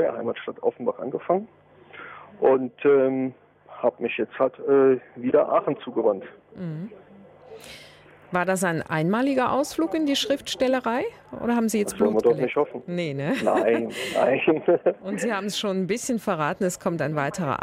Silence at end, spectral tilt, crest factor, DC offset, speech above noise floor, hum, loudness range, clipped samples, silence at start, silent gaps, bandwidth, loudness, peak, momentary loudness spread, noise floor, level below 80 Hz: 0.05 s; -5 dB/octave; 18 dB; under 0.1%; 25 dB; none; 4 LU; under 0.1%; 0 s; none; 16 kHz; -24 LUFS; -8 dBFS; 13 LU; -49 dBFS; -64 dBFS